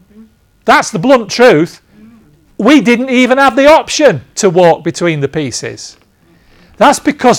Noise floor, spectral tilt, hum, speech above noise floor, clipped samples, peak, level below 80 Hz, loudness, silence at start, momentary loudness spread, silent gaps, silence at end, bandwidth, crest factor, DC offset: -48 dBFS; -4.5 dB/octave; none; 39 dB; 1%; 0 dBFS; -46 dBFS; -9 LUFS; 0.65 s; 12 LU; none; 0 s; 18 kHz; 10 dB; under 0.1%